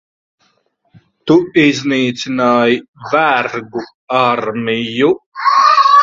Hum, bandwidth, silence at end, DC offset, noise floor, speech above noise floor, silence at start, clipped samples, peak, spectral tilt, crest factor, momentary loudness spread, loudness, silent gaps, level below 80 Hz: none; 7.8 kHz; 0 s; under 0.1%; -60 dBFS; 47 dB; 1.25 s; under 0.1%; 0 dBFS; -5 dB/octave; 14 dB; 10 LU; -13 LUFS; 2.88-2.93 s, 3.94-4.08 s, 5.26-5.32 s; -58 dBFS